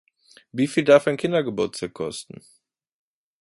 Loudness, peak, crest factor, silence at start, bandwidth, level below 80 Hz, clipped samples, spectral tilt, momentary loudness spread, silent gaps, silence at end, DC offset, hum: -22 LUFS; -4 dBFS; 20 dB; 0.55 s; 11.5 kHz; -64 dBFS; under 0.1%; -5.5 dB/octave; 18 LU; none; 1.2 s; under 0.1%; none